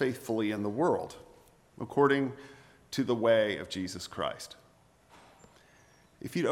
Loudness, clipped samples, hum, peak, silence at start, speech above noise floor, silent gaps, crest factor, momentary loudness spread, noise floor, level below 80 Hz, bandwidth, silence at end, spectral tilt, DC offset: -31 LUFS; under 0.1%; none; -12 dBFS; 0 s; 33 dB; none; 20 dB; 20 LU; -63 dBFS; -68 dBFS; 16 kHz; 0 s; -5.5 dB/octave; under 0.1%